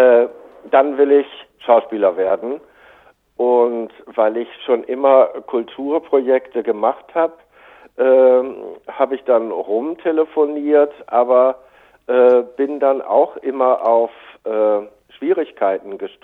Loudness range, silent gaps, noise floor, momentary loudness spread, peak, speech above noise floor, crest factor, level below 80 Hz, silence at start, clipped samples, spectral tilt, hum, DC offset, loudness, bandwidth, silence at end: 2 LU; none; -50 dBFS; 13 LU; 0 dBFS; 34 dB; 16 dB; -66 dBFS; 0 s; under 0.1%; -7.5 dB/octave; none; under 0.1%; -17 LUFS; 4 kHz; 0.15 s